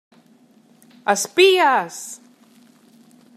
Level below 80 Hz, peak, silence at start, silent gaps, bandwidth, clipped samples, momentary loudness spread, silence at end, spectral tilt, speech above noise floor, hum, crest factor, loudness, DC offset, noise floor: -80 dBFS; -2 dBFS; 1.05 s; none; 15 kHz; under 0.1%; 21 LU; 1.2 s; -2 dB/octave; 37 dB; none; 18 dB; -17 LUFS; under 0.1%; -54 dBFS